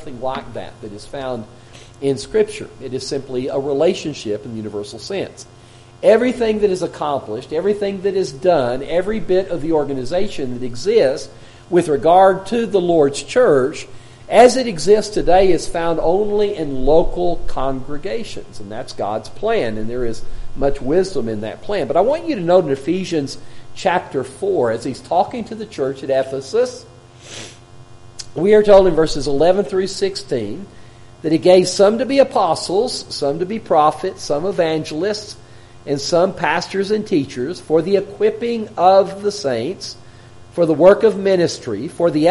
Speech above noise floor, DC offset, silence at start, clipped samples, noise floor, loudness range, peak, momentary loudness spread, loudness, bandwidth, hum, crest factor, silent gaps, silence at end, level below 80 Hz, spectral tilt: 23 dB; under 0.1%; 0 s; under 0.1%; -40 dBFS; 7 LU; 0 dBFS; 15 LU; -17 LUFS; 11.5 kHz; none; 18 dB; none; 0 s; -36 dBFS; -5 dB/octave